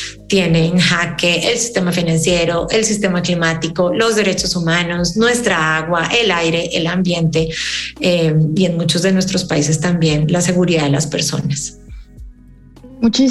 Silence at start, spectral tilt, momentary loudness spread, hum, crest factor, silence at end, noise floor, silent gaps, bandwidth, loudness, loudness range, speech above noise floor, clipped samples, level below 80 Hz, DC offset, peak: 0 s; -4.5 dB/octave; 4 LU; none; 12 dB; 0 s; -41 dBFS; none; 12.5 kHz; -15 LUFS; 2 LU; 27 dB; under 0.1%; -40 dBFS; under 0.1%; -2 dBFS